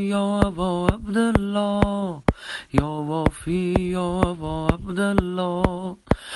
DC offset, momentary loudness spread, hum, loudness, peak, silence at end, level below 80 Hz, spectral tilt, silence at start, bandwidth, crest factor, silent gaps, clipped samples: under 0.1%; 5 LU; none; -23 LUFS; -4 dBFS; 0 s; -34 dBFS; -7 dB/octave; 0 s; 11.5 kHz; 20 dB; none; under 0.1%